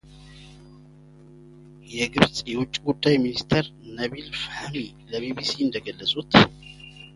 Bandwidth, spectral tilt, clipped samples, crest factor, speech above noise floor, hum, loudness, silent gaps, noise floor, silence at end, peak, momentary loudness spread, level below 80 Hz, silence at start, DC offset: 11.5 kHz; -5 dB/octave; under 0.1%; 26 dB; 25 dB; none; -24 LUFS; none; -49 dBFS; 0.05 s; 0 dBFS; 16 LU; -50 dBFS; 0.1 s; under 0.1%